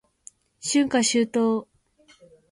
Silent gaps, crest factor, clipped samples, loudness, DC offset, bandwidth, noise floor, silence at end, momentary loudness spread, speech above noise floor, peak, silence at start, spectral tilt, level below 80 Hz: none; 16 dB; under 0.1%; -23 LUFS; under 0.1%; 11.5 kHz; -59 dBFS; 0.9 s; 8 LU; 37 dB; -10 dBFS; 0.65 s; -3 dB/octave; -66 dBFS